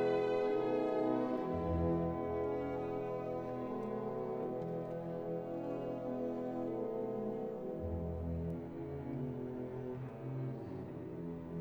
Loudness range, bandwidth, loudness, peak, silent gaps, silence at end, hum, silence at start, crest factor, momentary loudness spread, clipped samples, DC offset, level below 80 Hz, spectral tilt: 6 LU; over 20 kHz; -39 LUFS; -24 dBFS; none; 0 s; none; 0 s; 14 dB; 9 LU; under 0.1%; under 0.1%; -56 dBFS; -9.5 dB/octave